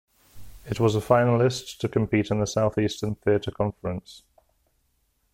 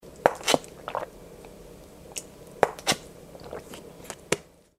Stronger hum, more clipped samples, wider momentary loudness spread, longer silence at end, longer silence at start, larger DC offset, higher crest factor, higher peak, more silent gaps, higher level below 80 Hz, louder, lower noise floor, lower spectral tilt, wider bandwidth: neither; neither; second, 11 LU vs 21 LU; first, 1.15 s vs 0.35 s; first, 0.35 s vs 0.05 s; neither; second, 20 dB vs 30 dB; second, -6 dBFS vs 0 dBFS; neither; about the same, -52 dBFS vs -56 dBFS; first, -25 LUFS vs -29 LUFS; first, -70 dBFS vs -47 dBFS; first, -6.5 dB/octave vs -2.5 dB/octave; about the same, 16 kHz vs 16 kHz